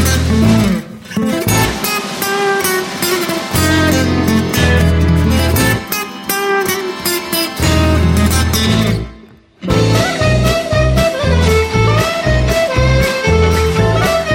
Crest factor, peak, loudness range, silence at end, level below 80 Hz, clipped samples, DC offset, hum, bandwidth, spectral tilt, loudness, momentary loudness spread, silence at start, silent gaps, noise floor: 12 dB; 0 dBFS; 2 LU; 0 s; -22 dBFS; under 0.1%; under 0.1%; none; 17 kHz; -5 dB/octave; -13 LUFS; 5 LU; 0 s; none; -40 dBFS